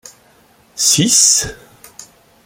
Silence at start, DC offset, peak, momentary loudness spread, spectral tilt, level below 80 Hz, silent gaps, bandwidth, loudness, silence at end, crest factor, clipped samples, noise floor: 0.75 s; under 0.1%; 0 dBFS; 17 LU; -1.5 dB/octave; -48 dBFS; none; over 20 kHz; -10 LUFS; 0.4 s; 18 dB; under 0.1%; -50 dBFS